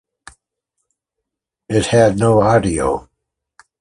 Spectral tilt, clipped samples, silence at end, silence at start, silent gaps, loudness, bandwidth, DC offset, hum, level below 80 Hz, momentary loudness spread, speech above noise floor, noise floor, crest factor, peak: -6 dB/octave; under 0.1%; 0.8 s; 1.7 s; none; -15 LUFS; 11.5 kHz; under 0.1%; none; -40 dBFS; 8 LU; 67 dB; -81 dBFS; 16 dB; -2 dBFS